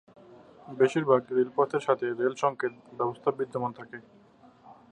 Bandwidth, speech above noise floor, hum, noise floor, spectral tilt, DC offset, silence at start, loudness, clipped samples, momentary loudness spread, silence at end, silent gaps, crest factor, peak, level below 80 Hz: 9.6 kHz; 29 dB; none; -57 dBFS; -6.5 dB/octave; under 0.1%; 0.65 s; -28 LUFS; under 0.1%; 15 LU; 0.2 s; none; 22 dB; -8 dBFS; -76 dBFS